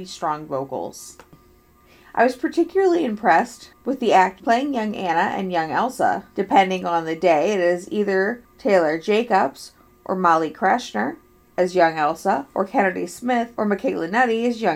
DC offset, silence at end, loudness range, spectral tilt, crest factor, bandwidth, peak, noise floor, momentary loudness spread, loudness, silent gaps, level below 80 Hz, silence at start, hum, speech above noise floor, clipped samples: under 0.1%; 0 s; 2 LU; -5 dB/octave; 20 dB; 16 kHz; -2 dBFS; -53 dBFS; 10 LU; -21 LUFS; none; -60 dBFS; 0 s; none; 33 dB; under 0.1%